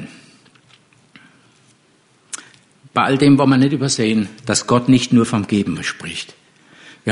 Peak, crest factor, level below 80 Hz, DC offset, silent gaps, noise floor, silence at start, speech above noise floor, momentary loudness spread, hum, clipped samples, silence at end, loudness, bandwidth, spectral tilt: -2 dBFS; 16 dB; -54 dBFS; under 0.1%; none; -56 dBFS; 0 s; 40 dB; 20 LU; none; under 0.1%; 0 s; -16 LUFS; 11 kHz; -5 dB/octave